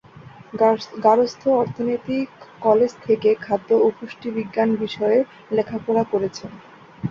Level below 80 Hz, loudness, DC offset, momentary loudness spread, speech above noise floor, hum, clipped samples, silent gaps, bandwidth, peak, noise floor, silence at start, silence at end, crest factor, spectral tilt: -60 dBFS; -21 LUFS; under 0.1%; 10 LU; 23 dB; none; under 0.1%; none; 7.2 kHz; -4 dBFS; -43 dBFS; 0.15 s; 0 s; 18 dB; -6.5 dB/octave